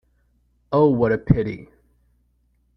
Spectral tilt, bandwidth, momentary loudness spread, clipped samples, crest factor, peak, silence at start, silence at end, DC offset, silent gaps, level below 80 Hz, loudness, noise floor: -11 dB/octave; 5.8 kHz; 12 LU; under 0.1%; 22 dB; -2 dBFS; 0.7 s; 1.1 s; under 0.1%; none; -44 dBFS; -20 LUFS; -64 dBFS